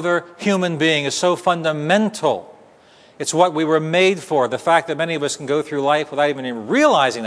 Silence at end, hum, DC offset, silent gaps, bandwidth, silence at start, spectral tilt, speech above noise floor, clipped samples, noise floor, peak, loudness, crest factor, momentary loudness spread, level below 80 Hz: 0 s; none; under 0.1%; none; 11 kHz; 0 s; -4 dB/octave; 31 dB; under 0.1%; -49 dBFS; 0 dBFS; -18 LUFS; 18 dB; 6 LU; -68 dBFS